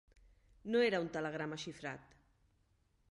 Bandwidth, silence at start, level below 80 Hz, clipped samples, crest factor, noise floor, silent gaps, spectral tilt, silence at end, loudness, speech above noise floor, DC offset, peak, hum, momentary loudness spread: 11 kHz; 0.65 s; -70 dBFS; under 0.1%; 20 dB; -75 dBFS; none; -5 dB/octave; 1.1 s; -38 LUFS; 38 dB; under 0.1%; -22 dBFS; none; 16 LU